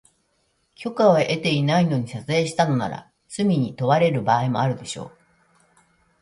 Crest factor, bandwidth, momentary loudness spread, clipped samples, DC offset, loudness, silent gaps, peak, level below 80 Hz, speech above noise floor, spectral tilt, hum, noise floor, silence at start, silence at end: 18 dB; 11.5 kHz; 15 LU; under 0.1%; under 0.1%; -21 LUFS; none; -4 dBFS; -60 dBFS; 47 dB; -6 dB/octave; none; -68 dBFS; 0.8 s; 1.15 s